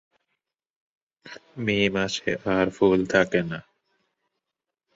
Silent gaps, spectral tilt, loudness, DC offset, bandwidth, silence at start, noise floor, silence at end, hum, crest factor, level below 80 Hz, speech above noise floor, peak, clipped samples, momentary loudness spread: none; -5.5 dB/octave; -23 LUFS; under 0.1%; 8 kHz; 1.25 s; -86 dBFS; 1.35 s; none; 22 dB; -56 dBFS; 62 dB; -4 dBFS; under 0.1%; 19 LU